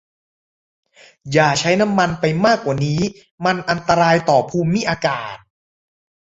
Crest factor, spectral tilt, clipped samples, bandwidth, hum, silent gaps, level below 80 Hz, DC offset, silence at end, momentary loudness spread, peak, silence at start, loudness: 18 dB; -5 dB/octave; under 0.1%; 8 kHz; none; 3.31-3.38 s; -50 dBFS; under 0.1%; 0.9 s; 7 LU; -2 dBFS; 1.25 s; -17 LUFS